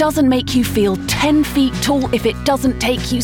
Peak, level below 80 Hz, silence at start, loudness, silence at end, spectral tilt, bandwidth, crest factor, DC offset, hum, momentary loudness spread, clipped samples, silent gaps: -4 dBFS; -32 dBFS; 0 s; -16 LUFS; 0 s; -5 dB/octave; 19 kHz; 12 dB; under 0.1%; none; 3 LU; under 0.1%; none